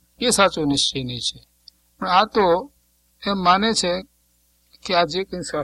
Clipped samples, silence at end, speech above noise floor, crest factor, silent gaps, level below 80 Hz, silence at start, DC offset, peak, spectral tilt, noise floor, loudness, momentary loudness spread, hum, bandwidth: under 0.1%; 0 s; 42 dB; 20 dB; none; -50 dBFS; 0.2 s; under 0.1%; -2 dBFS; -3 dB/octave; -62 dBFS; -20 LUFS; 12 LU; 60 Hz at -50 dBFS; 15.5 kHz